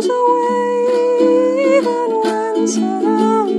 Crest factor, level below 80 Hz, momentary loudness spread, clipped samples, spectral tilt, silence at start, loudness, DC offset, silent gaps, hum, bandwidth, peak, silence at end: 12 dB; -70 dBFS; 4 LU; under 0.1%; -5 dB/octave; 0 s; -15 LUFS; under 0.1%; none; none; 11 kHz; -2 dBFS; 0 s